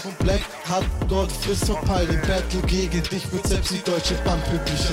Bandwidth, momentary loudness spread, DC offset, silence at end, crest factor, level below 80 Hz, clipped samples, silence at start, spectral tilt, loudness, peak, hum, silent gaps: 16.5 kHz; 3 LU; under 0.1%; 0 s; 14 dB; -28 dBFS; under 0.1%; 0 s; -5 dB/octave; -23 LUFS; -8 dBFS; none; none